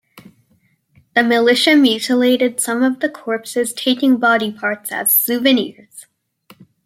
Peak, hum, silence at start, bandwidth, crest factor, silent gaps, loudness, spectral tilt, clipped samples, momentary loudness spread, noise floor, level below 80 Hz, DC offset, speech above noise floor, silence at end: -2 dBFS; none; 0.15 s; 16 kHz; 16 dB; none; -15 LUFS; -2.5 dB/octave; under 0.1%; 9 LU; -60 dBFS; -68 dBFS; under 0.1%; 44 dB; 0.85 s